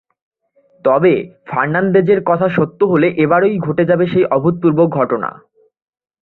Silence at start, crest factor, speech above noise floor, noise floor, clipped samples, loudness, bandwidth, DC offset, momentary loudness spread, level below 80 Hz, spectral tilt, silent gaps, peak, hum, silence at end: 0.85 s; 14 dB; 41 dB; -55 dBFS; under 0.1%; -14 LUFS; 4.2 kHz; under 0.1%; 6 LU; -54 dBFS; -11 dB/octave; none; -2 dBFS; none; 0.9 s